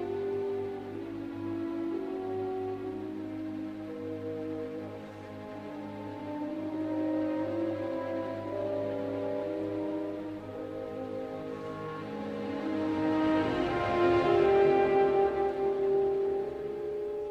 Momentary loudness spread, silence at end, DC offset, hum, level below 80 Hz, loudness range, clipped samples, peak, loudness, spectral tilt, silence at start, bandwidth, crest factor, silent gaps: 14 LU; 0 s; under 0.1%; none; -60 dBFS; 11 LU; under 0.1%; -14 dBFS; -32 LUFS; -7.5 dB/octave; 0 s; 8.4 kHz; 16 dB; none